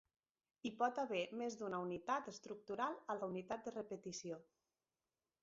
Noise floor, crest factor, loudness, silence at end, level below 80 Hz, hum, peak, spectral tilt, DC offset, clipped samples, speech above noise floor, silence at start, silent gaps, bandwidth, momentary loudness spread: under -90 dBFS; 20 dB; -45 LUFS; 1 s; -84 dBFS; none; -24 dBFS; -3.5 dB/octave; under 0.1%; under 0.1%; over 46 dB; 0.65 s; none; 7.6 kHz; 10 LU